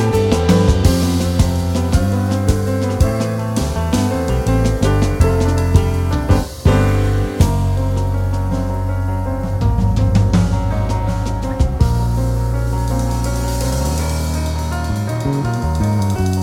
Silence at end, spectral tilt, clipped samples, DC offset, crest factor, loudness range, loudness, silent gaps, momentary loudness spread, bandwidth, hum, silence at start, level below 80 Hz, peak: 0 s; -6.5 dB/octave; under 0.1%; under 0.1%; 14 dB; 3 LU; -17 LUFS; none; 6 LU; 16.5 kHz; none; 0 s; -22 dBFS; 0 dBFS